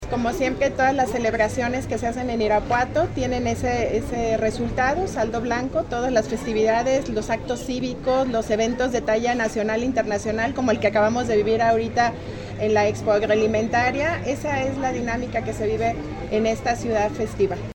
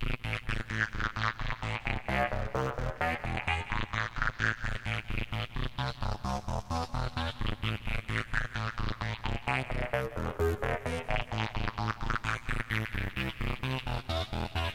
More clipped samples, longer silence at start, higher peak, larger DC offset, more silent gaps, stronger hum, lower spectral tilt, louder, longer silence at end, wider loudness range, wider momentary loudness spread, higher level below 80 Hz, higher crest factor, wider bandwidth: neither; about the same, 0 s vs 0 s; first, -6 dBFS vs -12 dBFS; neither; neither; neither; about the same, -5.5 dB/octave vs -5.5 dB/octave; first, -22 LUFS vs -34 LUFS; about the same, 0.05 s vs 0 s; about the same, 2 LU vs 2 LU; about the same, 6 LU vs 4 LU; about the same, -40 dBFS vs -40 dBFS; second, 16 dB vs 22 dB; about the same, 17 kHz vs 16 kHz